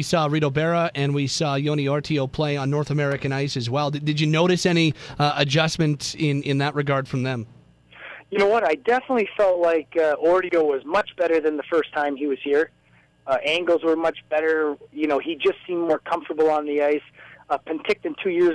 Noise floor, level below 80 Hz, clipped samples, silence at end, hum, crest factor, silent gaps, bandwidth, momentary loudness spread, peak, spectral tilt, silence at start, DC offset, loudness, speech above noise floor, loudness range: -55 dBFS; -56 dBFS; under 0.1%; 0 s; none; 16 dB; none; 11 kHz; 7 LU; -6 dBFS; -5.5 dB/octave; 0 s; under 0.1%; -22 LUFS; 33 dB; 3 LU